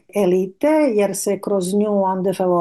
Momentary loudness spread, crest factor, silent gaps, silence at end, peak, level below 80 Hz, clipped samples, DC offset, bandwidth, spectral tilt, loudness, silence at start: 4 LU; 10 dB; none; 0 s; -8 dBFS; -64 dBFS; under 0.1%; under 0.1%; 12.5 kHz; -6 dB/octave; -18 LUFS; 0.15 s